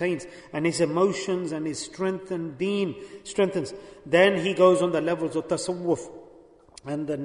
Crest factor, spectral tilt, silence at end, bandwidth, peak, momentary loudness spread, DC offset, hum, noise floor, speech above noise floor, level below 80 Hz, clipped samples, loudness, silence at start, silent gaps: 20 dB; -5 dB/octave; 0 s; 11 kHz; -6 dBFS; 14 LU; under 0.1%; none; -52 dBFS; 27 dB; -64 dBFS; under 0.1%; -25 LUFS; 0 s; none